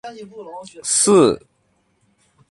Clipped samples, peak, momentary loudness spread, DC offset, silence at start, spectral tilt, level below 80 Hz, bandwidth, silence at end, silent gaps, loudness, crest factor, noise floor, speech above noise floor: under 0.1%; -2 dBFS; 23 LU; under 0.1%; 0.05 s; -3.5 dB/octave; -58 dBFS; 11.5 kHz; 1.15 s; none; -16 LUFS; 18 dB; -64 dBFS; 46 dB